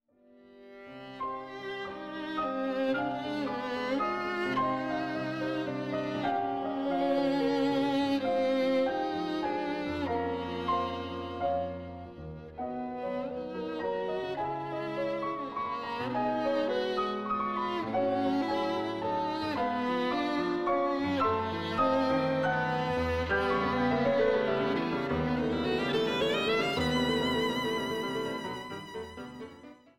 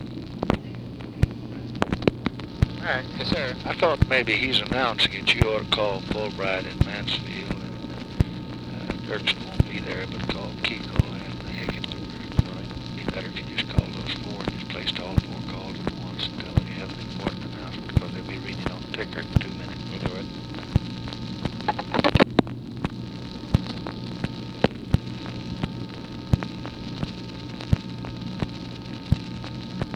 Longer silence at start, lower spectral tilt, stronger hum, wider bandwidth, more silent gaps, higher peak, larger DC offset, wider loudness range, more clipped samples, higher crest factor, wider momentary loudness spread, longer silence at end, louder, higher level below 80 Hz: first, 0.5 s vs 0 s; about the same, -6 dB/octave vs -6 dB/octave; neither; first, 15 kHz vs 12 kHz; neither; second, -16 dBFS vs 0 dBFS; neither; about the same, 6 LU vs 7 LU; neither; second, 14 dB vs 26 dB; second, 10 LU vs 13 LU; first, 0.25 s vs 0 s; second, -31 LUFS vs -27 LUFS; second, -56 dBFS vs -38 dBFS